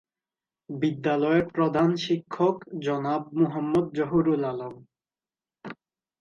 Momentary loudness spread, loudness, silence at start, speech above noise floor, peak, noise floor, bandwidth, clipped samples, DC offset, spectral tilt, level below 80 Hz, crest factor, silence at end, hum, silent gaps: 17 LU; -26 LUFS; 0.7 s; over 65 dB; -10 dBFS; under -90 dBFS; 7.2 kHz; under 0.1%; under 0.1%; -7.5 dB/octave; -62 dBFS; 18 dB; 0.45 s; none; none